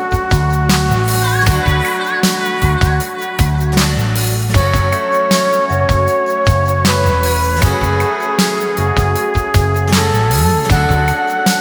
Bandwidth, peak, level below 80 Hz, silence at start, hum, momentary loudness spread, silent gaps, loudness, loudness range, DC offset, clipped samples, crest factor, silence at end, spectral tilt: over 20 kHz; 0 dBFS; -24 dBFS; 0 s; none; 3 LU; none; -14 LUFS; 1 LU; under 0.1%; under 0.1%; 12 dB; 0 s; -5 dB/octave